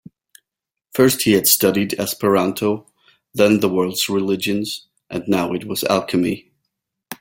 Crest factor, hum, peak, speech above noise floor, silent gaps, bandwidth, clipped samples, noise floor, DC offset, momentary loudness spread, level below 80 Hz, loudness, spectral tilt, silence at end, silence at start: 20 dB; none; 0 dBFS; 66 dB; none; 17 kHz; under 0.1%; -84 dBFS; under 0.1%; 14 LU; -56 dBFS; -18 LUFS; -4 dB/octave; 0.05 s; 0.95 s